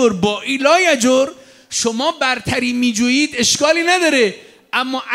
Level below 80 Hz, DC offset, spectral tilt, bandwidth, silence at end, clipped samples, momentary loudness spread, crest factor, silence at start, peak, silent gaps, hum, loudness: -54 dBFS; under 0.1%; -2.5 dB/octave; 16 kHz; 0 s; under 0.1%; 7 LU; 14 dB; 0 s; -2 dBFS; none; none; -15 LUFS